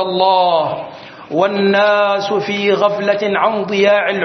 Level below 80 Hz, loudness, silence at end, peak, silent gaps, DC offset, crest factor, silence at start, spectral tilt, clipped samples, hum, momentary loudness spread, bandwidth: -64 dBFS; -14 LUFS; 0 s; 0 dBFS; none; under 0.1%; 14 dB; 0 s; -5.5 dB/octave; under 0.1%; none; 10 LU; 6.4 kHz